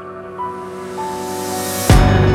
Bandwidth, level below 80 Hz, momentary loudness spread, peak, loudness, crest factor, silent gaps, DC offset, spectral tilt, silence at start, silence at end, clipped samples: 17.5 kHz; -22 dBFS; 16 LU; 0 dBFS; -18 LUFS; 16 dB; none; under 0.1%; -5.5 dB/octave; 0 s; 0 s; under 0.1%